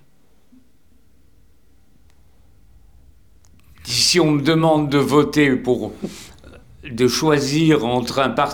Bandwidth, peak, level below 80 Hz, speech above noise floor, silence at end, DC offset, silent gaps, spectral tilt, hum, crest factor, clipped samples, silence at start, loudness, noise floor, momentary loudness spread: 19 kHz; -2 dBFS; -50 dBFS; 41 dB; 0 s; 0.3%; none; -4.5 dB/octave; none; 18 dB; under 0.1%; 3.85 s; -17 LUFS; -58 dBFS; 18 LU